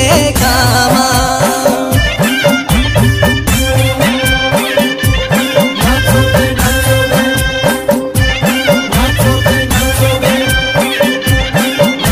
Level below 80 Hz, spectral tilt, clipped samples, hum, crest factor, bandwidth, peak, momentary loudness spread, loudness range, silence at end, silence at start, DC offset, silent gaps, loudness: -20 dBFS; -4.5 dB/octave; under 0.1%; none; 10 dB; 16 kHz; 0 dBFS; 3 LU; 1 LU; 0 s; 0 s; under 0.1%; none; -10 LUFS